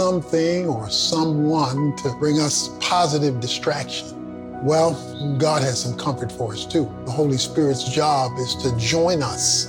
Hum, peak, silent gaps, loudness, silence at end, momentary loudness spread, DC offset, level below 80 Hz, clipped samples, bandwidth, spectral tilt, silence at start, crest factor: none; -6 dBFS; none; -21 LUFS; 0 s; 8 LU; under 0.1%; -50 dBFS; under 0.1%; 18 kHz; -4.5 dB/octave; 0 s; 14 dB